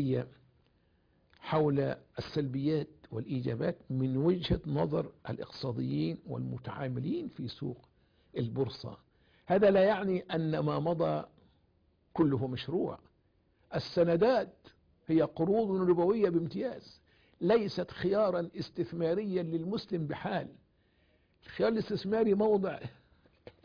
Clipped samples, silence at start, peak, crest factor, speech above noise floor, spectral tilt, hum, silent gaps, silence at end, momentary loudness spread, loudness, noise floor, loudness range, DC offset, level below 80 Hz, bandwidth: under 0.1%; 0 s; -16 dBFS; 16 dB; 39 dB; -6.5 dB/octave; none; none; 0.15 s; 14 LU; -32 LUFS; -71 dBFS; 6 LU; under 0.1%; -58 dBFS; 5.2 kHz